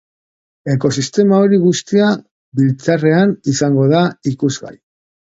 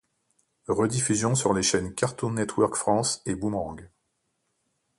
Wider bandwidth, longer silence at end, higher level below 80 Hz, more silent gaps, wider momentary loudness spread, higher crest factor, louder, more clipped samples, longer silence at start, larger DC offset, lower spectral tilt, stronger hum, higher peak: second, 8 kHz vs 11.5 kHz; second, 0.5 s vs 1.15 s; about the same, -56 dBFS vs -54 dBFS; first, 2.31-2.52 s vs none; about the same, 8 LU vs 8 LU; about the same, 14 dB vs 18 dB; first, -14 LUFS vs -26 LUFS; neither; about the same, 0.65 s vs 0.7 s; neither; first, -6 dB/octave vs -4.5 dB/octave; neither; first, 0 dBFS vs -10 dBFS